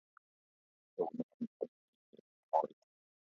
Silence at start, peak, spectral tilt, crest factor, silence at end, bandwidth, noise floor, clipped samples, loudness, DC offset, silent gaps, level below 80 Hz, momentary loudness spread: 1 s; -18 dBFS; -8 dB/octave; 26 dB; 0.7 s; 7 kHz; under -90 dBFS; under 0.1%; -41 LUFS; under 0.1%; 1.23-1.40 s, 1.47-1.60 s, 1.68-2.13 s, 2.20-2.49 s; under -90 dBFS; 10 LU